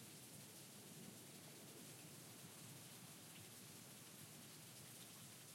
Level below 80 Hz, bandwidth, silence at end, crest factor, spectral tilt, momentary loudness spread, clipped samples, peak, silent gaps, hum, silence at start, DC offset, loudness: under -90 dBFS; 16.5 kHz; 0 s; 14 dB; -3 dB/octave; 1 LU; under 0.1%; -46 dBFS; none; none; 0 s; under 0.1%; -57 LUFS